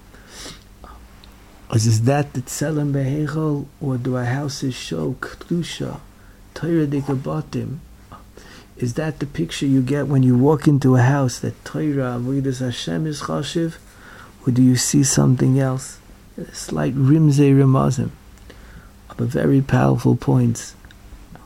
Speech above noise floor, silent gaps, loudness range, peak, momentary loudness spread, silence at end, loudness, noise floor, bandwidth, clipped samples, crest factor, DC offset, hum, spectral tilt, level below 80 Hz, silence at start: 25 dB; none; 7 LU; -2 dBFS; 14 LU; 0.1 s; -19 LUFS; -44 dBFS; 15 kHz; under 0.1%; 18 dB; under 0.1%; none; -6 dB/octave; -44 dBFS; 0.15 s